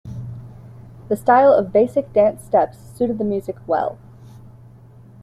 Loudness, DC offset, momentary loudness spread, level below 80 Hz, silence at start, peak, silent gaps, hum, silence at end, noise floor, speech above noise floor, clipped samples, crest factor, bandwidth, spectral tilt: -18 LUFS; under 0.1%; 17 LU; -52 dBFS; 0.05 s; -2 dBFS; none; none; 0.85 s; -44 dBFS; 27 dB; under 0.1%; 18 dB; 13.5 kHz; -7.5 dB/octave